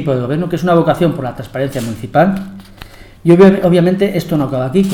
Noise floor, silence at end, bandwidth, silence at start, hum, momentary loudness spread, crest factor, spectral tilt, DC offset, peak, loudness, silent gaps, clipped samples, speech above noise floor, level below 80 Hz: -35 dBFS; 0 s; 16.5 kHz; 0 s; none; 14 LU; 12 dB; -7.5 dB/octave; under 0.1%; 0 dBFS; -13 LUFS; none; 0.1%; 23 dB; -40 dBFS